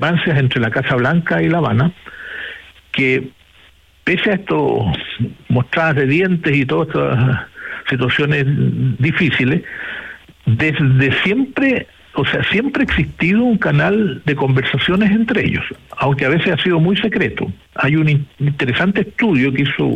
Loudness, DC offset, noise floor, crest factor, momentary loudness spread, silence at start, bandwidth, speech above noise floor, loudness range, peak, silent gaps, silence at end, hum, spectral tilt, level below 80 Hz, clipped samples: -16 LUFS; under 0.1%; -48 dBFS; 12 dB; 10 LU; 0 s; 8.2 kHz; 33 dB; 3 LU; -4 dBFS; none; 0 s; none; -8 dB/octave; -42 dBFS; under 0.1%